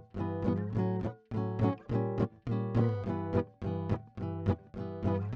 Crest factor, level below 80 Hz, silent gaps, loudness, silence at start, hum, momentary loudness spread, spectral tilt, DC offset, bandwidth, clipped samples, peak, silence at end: 18 dB; -54 dBFS; none; -34 LUFS; 0 s; none; 6 LU; -10.5 dB/octave; under 0.1%; 5.8 kHz; under 0.1%; -16 dBFS; 0 s